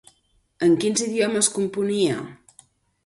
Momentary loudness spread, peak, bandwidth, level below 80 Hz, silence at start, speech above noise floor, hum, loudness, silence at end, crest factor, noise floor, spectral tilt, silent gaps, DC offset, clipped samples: 6 LU; -4 dBFS; 11.5 kHz; -64 dBFS; 0.6 s; 43 dB; none; -22 LUFS; 0.7 s; 18 dB; -65 dBFS; -3.5 dB/octave; none; under 0.1%; under 0.1%